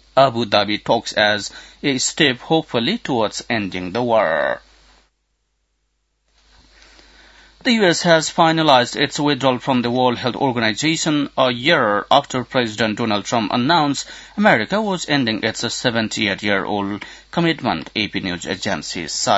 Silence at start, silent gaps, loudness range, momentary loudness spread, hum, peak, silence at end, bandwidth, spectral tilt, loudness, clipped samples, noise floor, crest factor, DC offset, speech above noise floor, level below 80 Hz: 0.15 s; none; 7 LU; 8 LU; none; 0 dBFS; 0 s; 8 kHz; -4 dB/octave; -18 LUFS; under 0.1%; -69 dBFS; 18 dB; under 0.1%; 51 dB; -54 dBFS